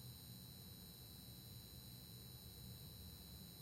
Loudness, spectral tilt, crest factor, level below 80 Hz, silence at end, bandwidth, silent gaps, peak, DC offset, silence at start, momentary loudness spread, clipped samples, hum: -56 LUFS; -4 dB/octave; 14 dB; -68 dBFS; 0 s; 16.5 kHz; none; -44 dBFS; under 0.1%; 0 s; 1 LU; under 0.1%; none